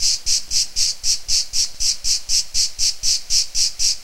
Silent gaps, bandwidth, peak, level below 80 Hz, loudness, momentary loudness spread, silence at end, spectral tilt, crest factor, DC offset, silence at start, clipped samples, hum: none; 16.5 kHz; -2 dBFS; -36 dBFS; -17 LUFS; 3 LU; 0 s; 3 dB/octave; 16 dB; 1%; 0 s; under 0.1%; none